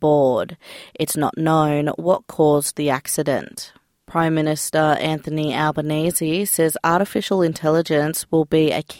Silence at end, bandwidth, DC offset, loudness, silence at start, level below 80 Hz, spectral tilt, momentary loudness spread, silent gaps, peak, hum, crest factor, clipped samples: 0 s; 17 kHz; under 0.1%; -19 LUFS; 0 s; -56 dBFS; -5 dB/octave; 7 LU; none; -4 dBFS; none; 16 dB; under 0.1%